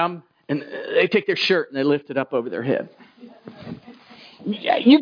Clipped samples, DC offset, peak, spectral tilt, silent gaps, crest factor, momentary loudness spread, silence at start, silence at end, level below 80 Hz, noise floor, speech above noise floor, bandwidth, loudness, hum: under 0.1%; under 0.1%; -2 dBFS; -6.5 dB/octave; none; 20 dB; 19 LU; 0 s; 0 s; -72 dBFS; -46 dBFS; 26 dB; 5.2 kHz; -22 LUFS; none